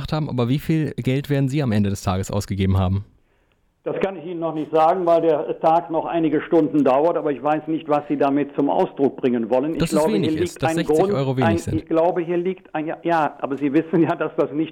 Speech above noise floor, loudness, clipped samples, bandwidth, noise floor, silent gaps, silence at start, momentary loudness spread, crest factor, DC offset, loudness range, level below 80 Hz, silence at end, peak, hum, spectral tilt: 43 dB; -21 LUFS; under 0.1%; 18 kHz; -63 dBFS; none; 0 s; 7 LU; 12 dB; under 0.1%; 4 LU; -48 dBFS; 0 s; -8 dBFS; none; -7 dB/octave